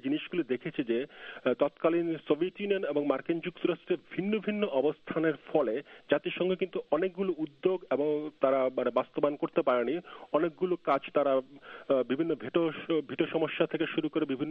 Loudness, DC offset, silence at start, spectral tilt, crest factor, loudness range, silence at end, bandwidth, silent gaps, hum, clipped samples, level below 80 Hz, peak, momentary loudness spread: -31 LUFS; under 0.1%; 0.05 s; -9 dB/octave; 20 dB; 1 LU; 0 s; 4.8 kHz; none; none; under 0.1%; -74 dBFS; -12 dBFS; 5 LU